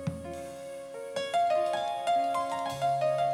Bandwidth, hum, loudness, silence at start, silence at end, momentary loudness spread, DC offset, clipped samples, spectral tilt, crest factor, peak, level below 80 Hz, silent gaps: 15.5 kHz; none; -30 LUFS; 0 s; 0 s; 13 LU; under 0.1%; under 0.1%; -4.5 dB/octave; 12 dB; -18 dBFS; -68 dBFS; none